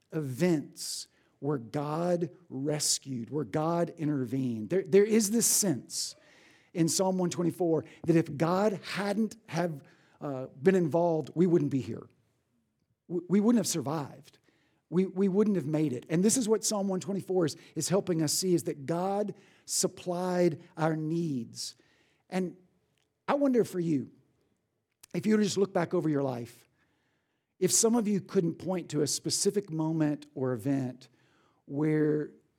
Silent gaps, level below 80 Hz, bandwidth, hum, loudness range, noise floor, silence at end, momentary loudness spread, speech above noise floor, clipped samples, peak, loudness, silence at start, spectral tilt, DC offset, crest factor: none; -80 dBFS; 18.5 kHz; none; 4 LU; -80 dBFS; 0.25 s; 12 LU; 50 dB; under 0.1%; -10 dBFS; -30 LUFS; 0.1 s; -5 dB/octave; under 0.1%; 20 dB